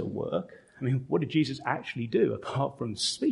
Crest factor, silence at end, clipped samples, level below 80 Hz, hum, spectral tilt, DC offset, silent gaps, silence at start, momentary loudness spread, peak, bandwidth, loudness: 18 dB; 0 s; under 0.1%; -64 dBFS; none; -5.5 dB/octave; under 0.1%; none; 0 s; 6 LU; -12 dBFS; 11.5 kHz; -30 LUFS